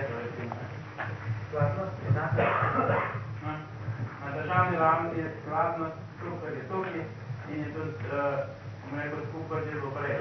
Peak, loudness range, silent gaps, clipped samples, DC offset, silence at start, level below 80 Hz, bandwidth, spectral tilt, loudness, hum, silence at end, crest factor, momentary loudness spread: -10 dBFS; 6 LU; none; under 0.1%; under 0.1%; 0 s; -60 dBFS; 6.2 kHz; -8.5 dB/octave; -31 LUFS; none; 0 s; 20 dB; 12 LU